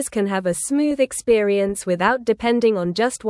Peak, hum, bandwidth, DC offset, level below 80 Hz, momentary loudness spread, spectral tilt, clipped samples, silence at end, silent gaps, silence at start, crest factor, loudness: -4 dBFS; none; 12 kHz; under 0.1%; -52 dBFS; 4 LU; -4.5 dB/octave; under 0.1%; 0 s; none; 0 s; 16 dB; -20 LUFS